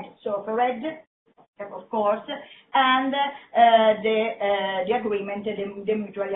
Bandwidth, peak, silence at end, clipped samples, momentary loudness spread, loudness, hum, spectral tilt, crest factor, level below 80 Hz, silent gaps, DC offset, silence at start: 4 kHz; -4 dBFS; 0 s; under 0.1%; 17 LU; -23 LUFS; none; -8.5 dB/octave; 20 dB; -68 dBFS; 1.07-1.26 s, 1.48-1.53 s; under 0.1%; 0 s